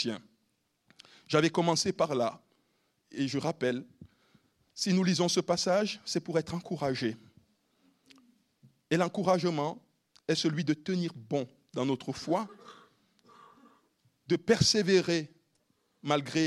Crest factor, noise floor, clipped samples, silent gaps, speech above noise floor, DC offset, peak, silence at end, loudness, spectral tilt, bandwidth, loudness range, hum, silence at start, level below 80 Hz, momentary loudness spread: 22 dB; -76 dBFS; under 0.1%; none; 47 dB; under 0.1%; -10 dBFS; 0 s; -30 LUFS; -4.5 dB/octave; 13.5 kHz; 4 LU; none; 0 s; -66 dBFS; 12 LU